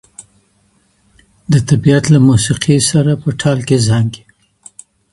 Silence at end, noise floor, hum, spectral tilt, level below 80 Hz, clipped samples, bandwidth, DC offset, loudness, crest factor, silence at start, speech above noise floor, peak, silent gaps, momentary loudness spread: 0.95 s; -56 dBFS; none; -5.5 dB/octave; -42 dBFS; under 0.1%; 11.5 kHz; under 0.1%; -12 LUFS; 14 dB; 0.2 s; 45 dB; 0 dBFS; none; 7 LU